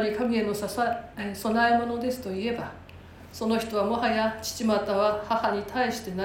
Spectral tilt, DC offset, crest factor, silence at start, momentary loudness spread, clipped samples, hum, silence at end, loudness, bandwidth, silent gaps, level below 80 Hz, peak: -4.5 dB/octave; under 0.1%; 16 dB; 0 s; 9 LU; under 0.1%; none; 0 s; -27 LUFS; 17 kHz; none; -54 dBFS; -12 dBFS